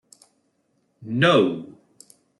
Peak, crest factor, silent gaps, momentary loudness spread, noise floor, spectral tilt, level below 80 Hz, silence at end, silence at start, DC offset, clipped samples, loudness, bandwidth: -6 dBFS; 20 dB; none; 27 LU; -69 dBFS; -6 dB/octave; -68 dBFS; 0.7 s; 1 s; under 0.1%; under 0.1%; -20 LUFS; 12 kHz